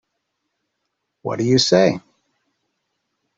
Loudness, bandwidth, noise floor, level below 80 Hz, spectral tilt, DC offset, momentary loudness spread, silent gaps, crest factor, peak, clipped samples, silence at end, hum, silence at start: -17 LUFS; 8.2 kHz; -76 dBFS; -58 dBFS; -4.5 dB/octave; under 0.1%; 17 LU; none; 20 dB; -2 dBFS; under 0.1%; 1.4 s; none; 1.25 s